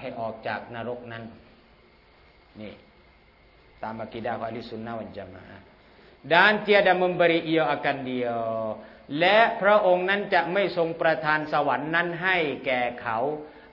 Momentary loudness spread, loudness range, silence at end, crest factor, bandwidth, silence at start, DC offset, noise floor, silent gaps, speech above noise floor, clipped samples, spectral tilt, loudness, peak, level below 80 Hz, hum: 20 LU; 16 LU; 0.15 s; 22 dB; 6 kHz; 0 s; under 0.1%; -56 dBFS; none; 32 dB; under 0.1%; -7 dB/octave; -24 LUFS; -4 dBFS; -62 dBFS; none